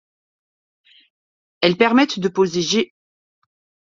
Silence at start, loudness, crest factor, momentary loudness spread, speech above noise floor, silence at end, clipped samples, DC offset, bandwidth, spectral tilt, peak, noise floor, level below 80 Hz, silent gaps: 1.6 s; -18 LUFS; 20 dB; 6 LU; over 73 dB; 1 s; under 0.1%; under 0.1%; 7.6 kHz; -4.5 dB/octave; -2 dBFS; under -90 dBFS; -62 dBFS; none